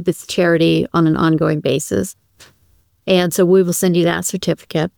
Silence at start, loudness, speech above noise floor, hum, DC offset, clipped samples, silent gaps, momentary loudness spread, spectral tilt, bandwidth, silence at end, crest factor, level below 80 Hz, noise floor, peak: 0 s; -16 LUFS; 42 dB; none; 0.1%; under 0.1%; none; 8 LU; -5.5 dB/octave; over 20 kHz; 0.1 s; 14 dB; -50 dBFS; -57 dBFS; -2 dBFS